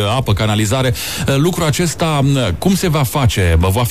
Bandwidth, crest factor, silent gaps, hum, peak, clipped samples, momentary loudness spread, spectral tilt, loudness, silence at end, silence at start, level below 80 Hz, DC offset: 15.5 kHz; 12 dB; none; none; -2 dBFS; under 0.1%; 2 LU; -5 dB/octave; -15 LUFS; 0 s; 0 s; -28 dBFS; 1%